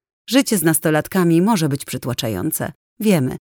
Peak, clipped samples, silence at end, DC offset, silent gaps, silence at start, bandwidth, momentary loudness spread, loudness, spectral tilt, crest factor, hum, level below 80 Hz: -2 dBFS; under 0.1%; 0.05 s; under 0.1%; 2.75-2.97 s; 0.3 s; over 20 kHz; 9 LU; -18 LUFS; -5 dB/octave; 16 dB; none; -54 dBFS